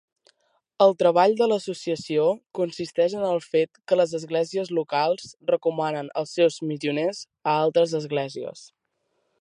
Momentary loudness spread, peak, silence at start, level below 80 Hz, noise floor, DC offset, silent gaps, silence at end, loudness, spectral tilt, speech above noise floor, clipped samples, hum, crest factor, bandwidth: 10 LU; -4 dBFS; 0.8 s; -74 dBFS; -74 dBFS; under 0.1%; none; 0.75 s; -24 LUFS; -5.5 dB/octave; 51 dB; under 0.1%; none; 20 dB; 10.5 kHz